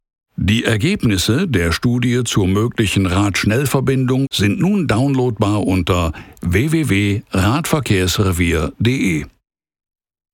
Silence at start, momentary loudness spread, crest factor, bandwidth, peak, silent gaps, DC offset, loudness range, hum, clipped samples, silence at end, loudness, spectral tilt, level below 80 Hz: 0.4 s; 3 LU; 14 dB; 17.5 kHz; -2 dBFS; none; under 0.1%; 1 LU; none; under 0.1%; 1.05 s; -16 LUFS; -5.5 dB/octave; -36 dBFS